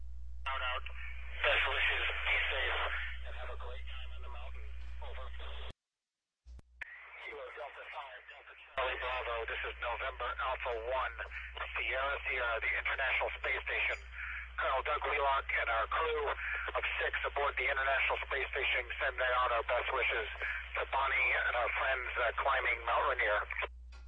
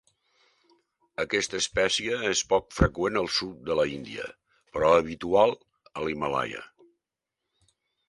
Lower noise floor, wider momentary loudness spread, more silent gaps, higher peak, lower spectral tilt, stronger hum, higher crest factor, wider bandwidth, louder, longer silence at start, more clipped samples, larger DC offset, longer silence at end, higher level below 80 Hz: first, under -90 dBFS vs -86 dBFS; about the same, 16 LU vs 15 LU; neither; second, -18 dBFS vs -6 dBFS; about the same, -4.5 dB/octave vs -3.5 dB/octave; neither; about the same, 18 dB vs 22 dB; second, 9 kHz vs 11.5 kHz; second, -34 LUFS vs -26 LUFS; second, 0 s vs 1.2 s; neither; neither; second, 0 s vs 1.45 s; about the same, -48 dBFS vs -44 dBFS